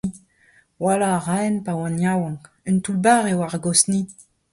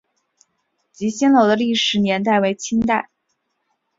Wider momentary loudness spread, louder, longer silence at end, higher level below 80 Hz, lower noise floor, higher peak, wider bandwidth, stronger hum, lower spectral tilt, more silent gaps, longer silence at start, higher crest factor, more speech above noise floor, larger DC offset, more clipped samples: about the same, 11 LU vs 10 LU; second, -21 LUFS vs -18 LUFS; second, 0.3 s vs 0.95 s; about the same, -58 dBFS vs -54 dBFS; second, -57 dBFS vs -72 dBFS; about the same, -2 dBFS vs -2 dBFS; first, 11.5 kHz vs 7.8 kHz; neither; about the same, -4.5 dB/octave vs -4.5 dB/octave; neither; second, 0.05 s vs 1 s; about the same, 20 dB vs 18 dB; second, 37 dB vs 55 dB; neither; neither